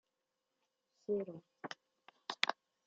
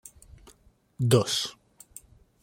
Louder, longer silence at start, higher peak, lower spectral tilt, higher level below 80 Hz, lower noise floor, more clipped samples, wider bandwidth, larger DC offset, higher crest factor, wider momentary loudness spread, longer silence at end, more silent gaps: second, -41 LUFS vs -26 LUFS; about the same, 1.1 s vs 1 s; second, -12 dBFS vs -6 dBFS; second, -1 dB/octave vs -5 dB/octave; second, -90 dBFS vs -60 dBFS; first, -88 dBFS vs -60 dBFS; neither; second, 7.6 kHz vs 16.5 kHz; neither; first, 34 dB vs 24 dB; second, 15 LU vs 26 LU; second, 0.35 s vs 0.9 s; neither